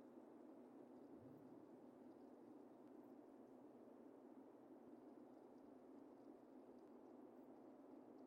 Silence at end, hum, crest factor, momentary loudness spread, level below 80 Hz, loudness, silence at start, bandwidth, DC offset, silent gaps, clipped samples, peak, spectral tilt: 0 s; none; 12 dB; 1 LU; under -90 dBFS; -64 LUFS; 0 s; 5.6 kHz; under 0.1%; none; under 0.1%; -50 dBFS; -7 dB/octave